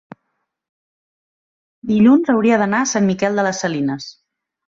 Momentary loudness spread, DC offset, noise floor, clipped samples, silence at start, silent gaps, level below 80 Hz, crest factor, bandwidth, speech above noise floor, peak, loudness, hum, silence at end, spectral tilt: 14 LU; under 0.1%; -73 dBFS; under 0.1%; 1.85 s; none; -60 dBFS; 16 dB; 7.6 kHz; 58 dB; -2 dBFS; -16 LUFS; none; 0.55 s; -5 dB/octave